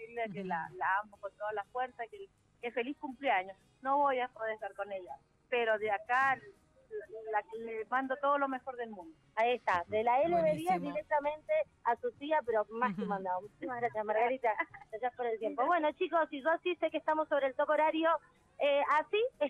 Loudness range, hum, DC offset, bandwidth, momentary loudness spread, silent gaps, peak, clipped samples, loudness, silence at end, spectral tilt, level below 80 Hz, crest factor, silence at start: 4 LU; none; under 0.1%; 12 kHz; 12 LU; none; -18 dBFS; under 0.1%; -34 LUFS; 0 s; -6 dB/octave; -74 dBFS; 16 dB; 0 s